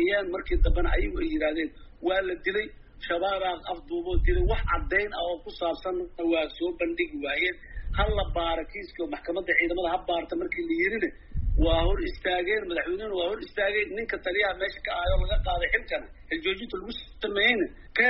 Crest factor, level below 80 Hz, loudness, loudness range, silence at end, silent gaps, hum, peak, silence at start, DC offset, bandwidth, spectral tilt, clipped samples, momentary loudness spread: 18 dB; -32 dBFS; -28 LUFS; 2 LU; 0 s; none; none; -10 dBFS; 0 s; under 0.1%; 5.8 kHz; -3 dB/octave; under 0.1%; 9 LU